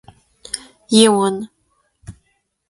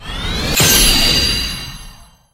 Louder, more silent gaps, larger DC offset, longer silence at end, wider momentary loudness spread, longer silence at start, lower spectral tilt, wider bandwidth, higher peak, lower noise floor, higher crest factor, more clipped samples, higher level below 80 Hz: second, -16 LUFS vs -12 LUFS; neither; neither; first, 0.6 s vs 0.3 s; about the same, 17 LU vs 15 LU; first, 0.55 s vs 0 s; first, -4 dB/octave vs -1.5 dB/octave; second, 11.5 kHz vs 16.5 kHz; about the same, 0 dBFS vs 0 dBFS; first, -67 dBFS vs -39 dBFS; about the same, 20 dB vs 16 dB; neither; second, -56 dBFS vs -24 dBFS